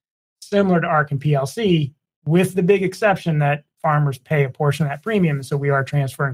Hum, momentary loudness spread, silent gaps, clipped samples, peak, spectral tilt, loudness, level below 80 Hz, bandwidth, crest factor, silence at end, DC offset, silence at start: none; 5 LU; 2.16-2.22 s; under 0.1%; -2 dBFS; -7 dB/octave; -19 LUFS; -58 dBFS; 15.5 kHz; 16 dB; 0 s; under 0.1%; 0.4 s